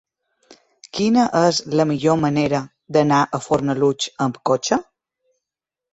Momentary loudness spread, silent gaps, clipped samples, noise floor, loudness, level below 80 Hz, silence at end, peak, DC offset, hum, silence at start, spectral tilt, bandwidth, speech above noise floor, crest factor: 6 LU; none; under 0.1%; -86 dBFS; -19 LUFS; -56 dBFS; 1.1 s; -2 dBFS; under 0.1%; none; 0.95 s; -5.5 dB/octave; 8.2 kHz; 68 dB; 18 dB